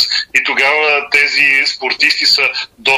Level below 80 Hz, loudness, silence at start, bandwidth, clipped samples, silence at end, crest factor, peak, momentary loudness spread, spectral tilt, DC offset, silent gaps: -56 dBFS; -10 LUFS; 0 s; 16 kHz; under 0.1%; 0 s; 12 dB; -2 dBFS; 5 LU; 0 dB/octave; under 0.1%; none